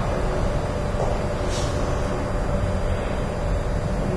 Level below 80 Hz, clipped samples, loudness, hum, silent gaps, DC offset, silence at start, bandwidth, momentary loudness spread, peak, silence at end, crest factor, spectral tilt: -28 dBFS; under 0.1%; -25 LUFS; none; none; under 0.1%; 0 s; 11 kHz; 1 LU; -10 dBFS; 0 s; 12 dB; -6.5 dB/octave